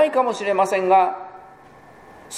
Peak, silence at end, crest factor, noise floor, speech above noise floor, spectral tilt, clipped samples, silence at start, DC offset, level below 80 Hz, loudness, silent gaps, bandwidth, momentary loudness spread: -6 dBFS; 0 s; 16 dB; -46 dBFS; 28 dB; -4 dB/octave; under 0.1%; 0 s; under 0.1%; -66 dBFS; -19 LUFS; none; 15 kHz; 16 LU